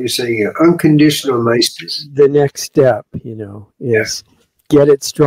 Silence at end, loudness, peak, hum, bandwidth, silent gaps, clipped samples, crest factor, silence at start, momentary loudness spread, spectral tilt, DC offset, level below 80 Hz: 0 s; -13 LUFS; 0 dBFS; none; 16 kHz; none; under 0.1%; 12 dB; 0 s; 16 LU; -5 dB/octave; under 0.1%; -52 dBFS